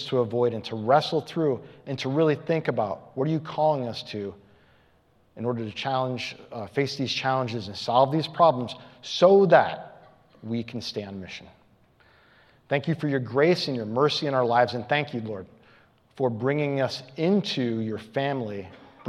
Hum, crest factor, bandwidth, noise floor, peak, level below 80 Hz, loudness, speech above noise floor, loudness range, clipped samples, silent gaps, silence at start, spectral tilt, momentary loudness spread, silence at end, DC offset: none; 24 dB; 12 kHz; -62 dBFS; -2 dBFS; -70 dBFS; -25 LUFS; 37 dB; 8 LU; under 0.1%; none; 0 s; -6 dB/octave; 14 LU; 0 s; under 0.1%